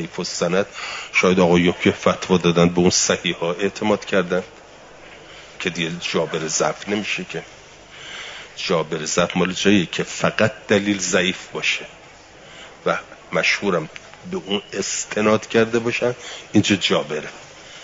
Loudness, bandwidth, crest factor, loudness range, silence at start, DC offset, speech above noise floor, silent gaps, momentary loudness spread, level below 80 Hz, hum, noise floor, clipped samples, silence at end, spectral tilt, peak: -20 LUFS; 7.8 kHz; 18 dB; 7 LU; 0 s; under 0.1%; 24 dB; none; 16 LU; -56 dBFS; none; -44 dBFS; under 0.1%; 0 s; -4 dB/octave; -2 dBFS